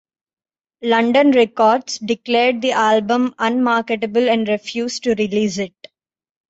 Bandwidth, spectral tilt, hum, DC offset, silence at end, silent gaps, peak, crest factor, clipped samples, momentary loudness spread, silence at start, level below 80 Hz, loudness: 8 kHz; -4.5 dB/octave; none; under 0.1%; 0.8 s; none; -4 dBFS; 14 dB; under 0.1%; 9 LU; 0.8 s; -62 dBFS; -17 LUFS